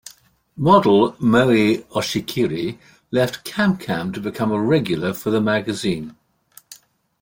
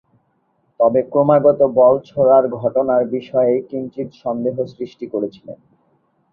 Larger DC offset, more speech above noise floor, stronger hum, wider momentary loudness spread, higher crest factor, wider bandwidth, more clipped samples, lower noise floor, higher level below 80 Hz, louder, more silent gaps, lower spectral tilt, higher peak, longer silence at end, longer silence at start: neither; second, 33 dB vs 48 dB; neither; second, 10 LU vs 14 LU; about the same, 18 dB vs 16 dB; first, 17 kHz vs 5.2 kHz; neither; second, -52 dBFS vs -64 dBFS; first, -54 dBFS vs -60 dBFS; about the same, -19 LUFS vs -17 LUFS; neither; second, -6 dB/octave vs -10 dB/octave; about the same, -2 dBFS vs 0 dBFS; second, 0.45 s vs 0.8 s; second, 0.55 s vs 0.8 s